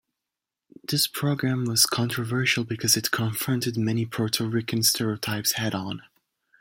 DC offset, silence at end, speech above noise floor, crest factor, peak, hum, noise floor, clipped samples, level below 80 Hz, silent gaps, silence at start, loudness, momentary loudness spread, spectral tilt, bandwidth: under 0.1%; 0.6 s; 62 dB; 24 dB; -2 dBFS; none; -87 dBFS; under 0.1%; -64 dBFS; none; 0.9 s; -24 LUFS; 7 LU; -3.5 dB/octave; 17 kHz